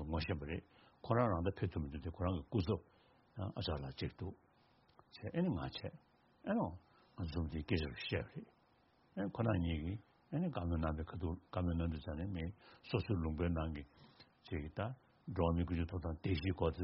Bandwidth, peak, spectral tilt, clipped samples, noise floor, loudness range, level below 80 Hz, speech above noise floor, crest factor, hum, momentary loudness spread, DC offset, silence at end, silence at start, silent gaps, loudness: 5.8 kHz; -18 dBFS; -6.5 dB/octave; under 0.1%; -72 dBFS; 3 LU; -52 dBFS; 33 dB; 22 dB; none; 13 LU; under 0.1%; 0 s; 0 s; none; -41 LUFS